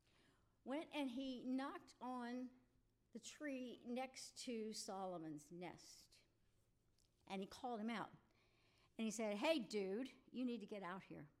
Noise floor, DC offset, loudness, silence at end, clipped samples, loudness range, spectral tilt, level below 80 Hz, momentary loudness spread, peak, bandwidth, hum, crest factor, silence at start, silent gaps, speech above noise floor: -80 dBFS; under 0.1%; -49 LUFS; 0.1 s; under 0.1%; 7 LU; -4 dB/octave; -84 dBFS; 13 LU; -28 dBFS; 15.5 kHz; none; 22 dB; 0.65 s; none; 31 dB